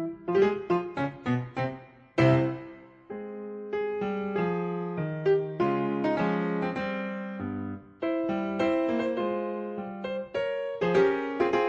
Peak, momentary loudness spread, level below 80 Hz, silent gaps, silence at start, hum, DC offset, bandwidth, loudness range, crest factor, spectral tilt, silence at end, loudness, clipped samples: -10 dBFS; 11 LU; -64 dBFS; none; 0 s; none; under 0.1%; 7.6 kHz; 2 LU; 18 dB; -8 dB/octave; 0 s; -29 LUFS; under 0.1%